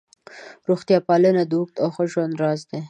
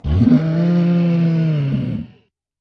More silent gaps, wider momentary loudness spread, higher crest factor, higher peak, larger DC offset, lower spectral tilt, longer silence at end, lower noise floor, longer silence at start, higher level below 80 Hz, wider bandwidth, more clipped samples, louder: neither; second, 8 LU vs 11 LU; about the same, 16 dB vs 14 dB; about the same, -4 dBFS vs -2 dBFS; neither; second, -7.5 dB/octave vs -10 dB/octave; second, 0 s vs 0.55 s; second, -43 dBFS vs -53 dBFS; first, 0.35 s vs 0.05 s; second, -70 dBFS vs -34 dBFS; first, 9.4 kHz vs 5.8 kHz; neither; second, -21 LUFS vs -16 LUFS